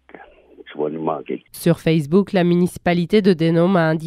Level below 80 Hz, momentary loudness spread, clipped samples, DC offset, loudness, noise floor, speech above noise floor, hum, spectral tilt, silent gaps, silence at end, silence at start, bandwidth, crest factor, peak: -52 dBFS; 11 LU; under 0.1%; under 0.1%; -18 LUFS; -45 dBFS; 27 dB; none; -7.5 dB/octave; none; 0 s; 0.65 s; 14 kHz; 16 dB; -2 dBFS